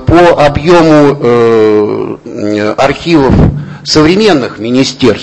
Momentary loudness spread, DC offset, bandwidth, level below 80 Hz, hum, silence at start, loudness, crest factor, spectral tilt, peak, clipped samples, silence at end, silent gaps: 9 LU; under 0.1%; 11 kHz; -26 dBFS; none; 0 s; -7 LUFS; 6 dB; -6 dB/octave; 0 dBFS; 4%; 0 s; none